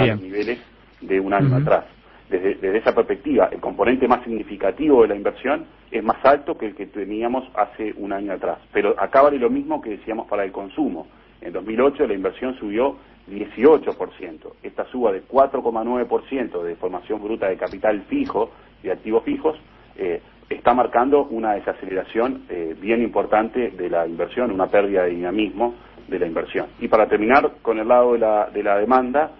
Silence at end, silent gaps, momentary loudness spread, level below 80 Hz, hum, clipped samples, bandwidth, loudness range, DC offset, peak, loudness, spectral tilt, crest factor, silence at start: 0.05 s; none; 12 LU; -50 dBFS; none; under 0.1%; 5.8 kHz; 5 LU; under 0.1%; -2 dBFS; -21 LUFS; -9.5 dB/octave; 18 dB; 0 s